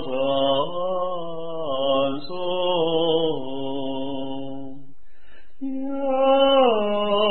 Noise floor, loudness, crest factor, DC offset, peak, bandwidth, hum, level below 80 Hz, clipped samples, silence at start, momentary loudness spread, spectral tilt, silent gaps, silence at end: -53 dBFS; -23 LUFS; 16 dB; 3%; -8 dBFS; 4.4 kHz; none; -56 dBFS; under 0.1%; 0 s; 14 LU; -9.5 dB/octave; none; 0 s